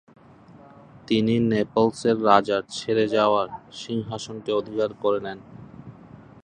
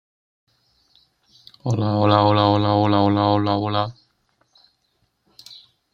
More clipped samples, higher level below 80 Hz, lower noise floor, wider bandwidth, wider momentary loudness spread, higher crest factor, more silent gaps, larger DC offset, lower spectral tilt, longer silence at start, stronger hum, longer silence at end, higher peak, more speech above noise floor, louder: neither; about the same, -58 dBFS vs -60 dBFS; second, -49 dBFS vs -69 dBFS; first, 10 kHz vs 7.2 kHz; first, 18 LU vs 11 LU; about the same, 22 dB vs 20 dB; neither; neither; second, -6 dB/octave vs -8 dB/octave; second, 1.1 s vs 1.65 s; neither; about the same, 0.5 s vs 0.4 s; about the same, -2 dBFS vs 0 dBFS; second, 26 dB vs 51 dB; second, -23 LUFS vs -19 LUFS